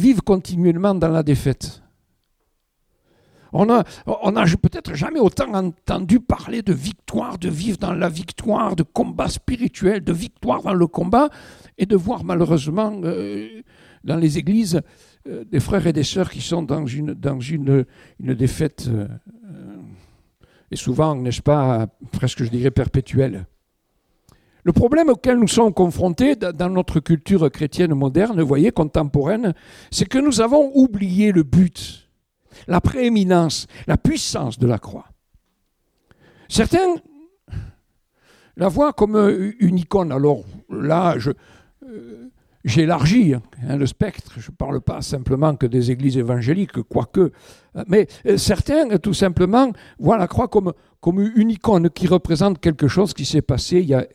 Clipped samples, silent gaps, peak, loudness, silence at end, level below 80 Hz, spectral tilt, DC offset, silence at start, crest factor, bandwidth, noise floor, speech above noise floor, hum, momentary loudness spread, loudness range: under 0.1%; none; 0 dBFS; -19 LUFS; 0.1 s; -40 dBFS; -6.5 dB/octave; under 0.1%; 0 s; 18 dB; 15 kHz; -69 dBFS; 51 dB; none; 10 LU; 5 LU